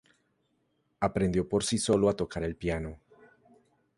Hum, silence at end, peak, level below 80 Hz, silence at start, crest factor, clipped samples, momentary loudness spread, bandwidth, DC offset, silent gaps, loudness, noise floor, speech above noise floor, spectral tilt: none; 1 s; -12 dBFS; -50 dBFS; 1 s; 20 dB; under 0.1%; 8 LU; 11.5 kHz; under 0.1%; none; -29 LUFS; -74 dBFS; 46 dB; -5 dB/octave